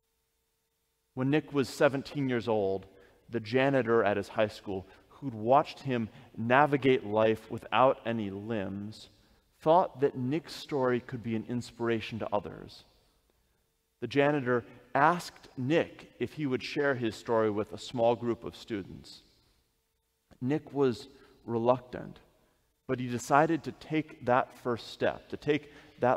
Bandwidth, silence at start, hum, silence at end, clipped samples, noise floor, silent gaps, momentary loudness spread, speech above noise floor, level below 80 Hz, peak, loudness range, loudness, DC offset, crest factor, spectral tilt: 15.5 kHz; 1.15 s; none; 0 s; under 0.1%; -78 dBFS; none; 14 LU; 48 dB; -66 dBFS; -8 dBFS; 5 LU; -30 LUFS; under 0.1%; 24 dB; -6.5 dB/octave